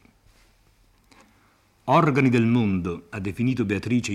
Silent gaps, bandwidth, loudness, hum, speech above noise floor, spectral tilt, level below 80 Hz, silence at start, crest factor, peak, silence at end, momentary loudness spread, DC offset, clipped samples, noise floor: none; 12.5 kHz; -22 LUFS; none; 39 dB; -7 dB/octave; -56 dBFS; 1.85 s; 16 dB; -8 dBFS; 0 s; 12 LU; under 0.1%; under 0.1%; -61 dBFS